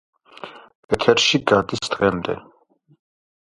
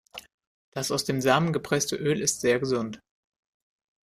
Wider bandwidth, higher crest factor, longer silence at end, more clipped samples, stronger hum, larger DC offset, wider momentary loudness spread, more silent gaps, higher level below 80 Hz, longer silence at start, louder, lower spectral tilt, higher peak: second, 11.5 kHz vs 15.5 kHz; about the same, 22 dB vs 22 dB; about the same, 1 s vs 1.05 s; neither; neither; neither; first, 23 LU vs 18 LU; second, 0.75-0.89 s vs 0.34-0.38 s, 0.47-0.72 s; first, -50 dBFS vs -62 dBFS; first, 0.45 s vs 0.15 s; first, -19 LUFS vs -26 LUFS; about the same, -4 dB/octave vs -4 dB/octave; first, 0 dBFS vs -6 dBFS